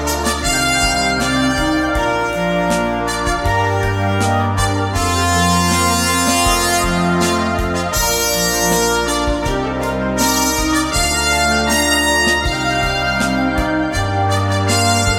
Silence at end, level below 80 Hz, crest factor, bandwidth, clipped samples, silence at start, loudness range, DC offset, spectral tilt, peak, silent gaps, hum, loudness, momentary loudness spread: 0 s; -28 dBFS; 14 dB; 18 kHz; under 0.1%; 0 s; 2 LU; under 0.1%; -3.5 dB/octave; -2 dBFS; none; none; -15 LUFS; 4 LU